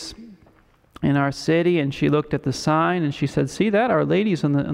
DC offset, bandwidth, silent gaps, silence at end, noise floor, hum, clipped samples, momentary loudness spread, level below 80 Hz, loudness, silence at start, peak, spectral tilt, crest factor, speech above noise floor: under 0.1%; 12 kHz; none; 0 s; -56 dBFS; none; under 0.1%; 5 LU; -52 dBFS; -21 LUFS; 0 s; -8 dBFS; -6.5 dB/octave; 14 dB; 36 dB